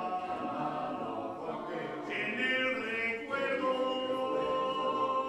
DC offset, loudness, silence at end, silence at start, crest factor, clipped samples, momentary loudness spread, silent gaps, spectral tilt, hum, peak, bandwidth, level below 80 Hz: under 0.1%; -33 LUFS; 0 s; 0 s; 14 dB; under 0.1%; 8 LU; none; -5 dB/octave; none; -20 dBFS; 11 kHz; -68 dBFS